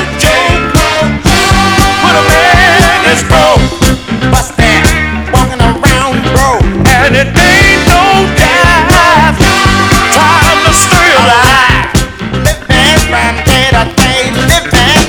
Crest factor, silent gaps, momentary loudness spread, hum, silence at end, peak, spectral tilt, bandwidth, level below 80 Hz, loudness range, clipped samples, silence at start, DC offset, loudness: 6 dB; none; 6 LU; none; 0 s; 0 dBFS; -4 dB/octave; over 20 kHz; -16 dBFS; 3 LU; 4%; 0 s; under 0.1%; -6 LUFS